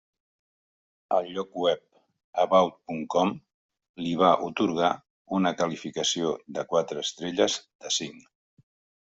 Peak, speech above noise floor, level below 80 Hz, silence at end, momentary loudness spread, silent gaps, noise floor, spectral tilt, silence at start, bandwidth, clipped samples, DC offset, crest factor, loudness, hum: -6 dBFS; over 64 dB; -68 dBFS; 0.8 s; 12 LU; 2.24-2.33 s, 3.54-3.69 s, 3.89-3.94 s, 5.10-5.25 s, 7.75-7.79 s; under -90 dBFS; -4 dB/octave; 1.1 s; 8.2 kHz; under 0.1%; under 0.1%; 22 dB; -27 LUFS; none